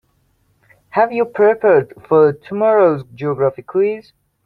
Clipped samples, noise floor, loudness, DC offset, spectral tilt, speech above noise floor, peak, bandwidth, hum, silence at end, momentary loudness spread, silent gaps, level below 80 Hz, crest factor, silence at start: under 0.1%; -61 dBFS; -16 LUFS; under 0.1%; -9.5 dB/octave; 46 dB; -2 dBFS; 4.8 kHz; none; 0.45 s; 9 LU; none; -60 dBFS; 16 dB; 0.95 s